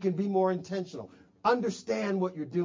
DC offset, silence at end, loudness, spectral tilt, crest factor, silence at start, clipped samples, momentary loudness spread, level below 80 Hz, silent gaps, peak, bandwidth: under 0.1%; 0 s; -30 LUFS; -6.5 dB/octave; 18 dB; 0 s; under 0.1%; 13 LU; -72 dBFS; none; -14 dBFS; 7.6 kHz